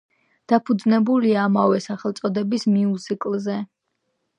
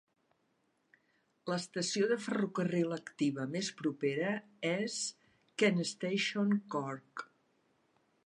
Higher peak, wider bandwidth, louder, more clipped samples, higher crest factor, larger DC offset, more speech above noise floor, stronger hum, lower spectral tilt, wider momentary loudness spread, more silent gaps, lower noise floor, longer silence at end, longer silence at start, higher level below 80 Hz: first, -2 dBFS vs -16 dBFS; second, 9.8 kHz vs 11.5 kHz; first, -21 LUFS vs -35 LUFS; neither; about the same, 18 dB vs 20 dB; neither; first, 54 dB vs 43 dB; neither; first, -7 dB/octave vs -4.5 dB/octave; about the same, 9 LU vs 10 LU; neither; about the same, -74 dBFS vs -77 dBFS; second, 0.75 s vs 1.05 s; second, 0.5 s vs 1.45 s; first, -72 dBFS vs -86 dBFS